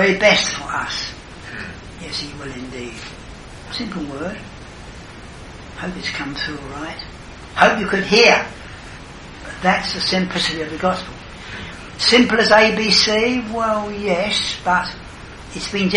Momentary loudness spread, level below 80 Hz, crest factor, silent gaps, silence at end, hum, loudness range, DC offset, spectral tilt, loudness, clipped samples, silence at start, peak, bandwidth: 24 LU; -42 dBFS; 20 dB; none; 0 s; none; 14 LU; under 0.1%; -3.5 dB/octave; -17 LUFS; under 0.1%; 0 s; 0 dBFS; 11.5 kHz